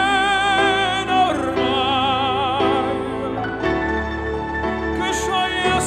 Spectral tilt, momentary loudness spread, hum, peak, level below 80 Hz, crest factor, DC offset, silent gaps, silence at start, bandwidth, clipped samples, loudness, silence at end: -4 dB/octave; 8 LU; none; -4 dBFS; -38 dBFS; 14 dB; under 0.1%; none; 0 s; 13.5 kHz; under 0.1%; -19 LUFS; 0 s